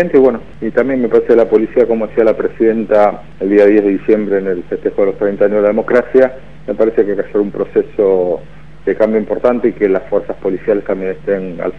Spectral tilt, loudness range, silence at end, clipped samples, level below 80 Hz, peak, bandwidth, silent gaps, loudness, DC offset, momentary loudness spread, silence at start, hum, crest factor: -9 dB/octave; 3 LU; 0 s; 0.4%; -42 dBFS; 0 dBFS; 5.8 kHz; none; -13 LUFS; 2%; 8 LU; 0 s; none; 14 dB